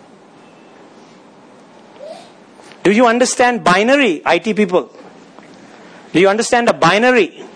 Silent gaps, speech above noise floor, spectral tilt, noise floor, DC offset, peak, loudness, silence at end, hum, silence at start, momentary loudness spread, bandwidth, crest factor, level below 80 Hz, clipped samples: none; 30 dB; -4 dB/octave; -43 dBFS; under 0.1%; 0 dBFS; -13 LUFS; 0.1 s; none; 2 s; 8 LU; 10.5 kHz; 16 dB; -58 dBFS; under 0.1%